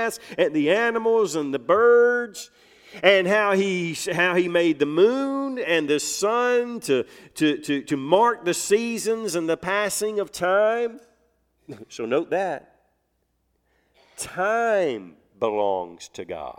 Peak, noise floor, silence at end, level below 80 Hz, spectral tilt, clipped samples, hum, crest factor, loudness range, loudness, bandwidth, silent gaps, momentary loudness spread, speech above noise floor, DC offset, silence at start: -2 dBFS; -71 dBFS; 0.05 s; -66 dBFS; -4 dB/octave; under 0.1%; none; 22 dB; 8 LU; -22 LUFS; 16.5 kHz; none; 13 LU; 49 dB; under 0.1%; 0 s